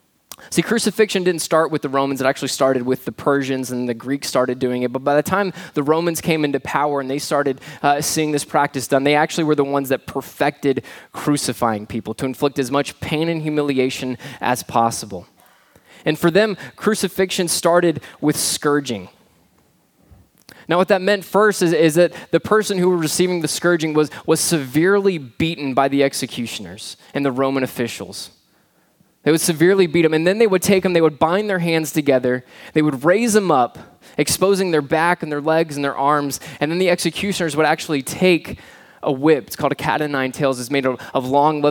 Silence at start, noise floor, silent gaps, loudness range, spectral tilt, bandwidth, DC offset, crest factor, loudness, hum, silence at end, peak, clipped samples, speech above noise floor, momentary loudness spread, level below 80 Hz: 0.3 s; -59 dBFS; none; 4 LU; -4.5 dB/octave; 19.5 kHz; under 0.1%; 18 dB; -19 LUFS; none; 0 s; 0 dBFS; under 0.1%; 41 dB; 8 LU; -56 dBFS